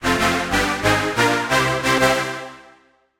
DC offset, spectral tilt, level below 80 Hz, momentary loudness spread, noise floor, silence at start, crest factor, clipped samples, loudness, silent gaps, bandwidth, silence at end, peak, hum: under 0.1%; -3.5 dB/octave; -40 dBFS; 8 LU; -54 dBFS; 0 s; 16 dB; under 0.1%; -18 LUFS; none; 16.5 kHz; 0.6 s; -4 dBFS; none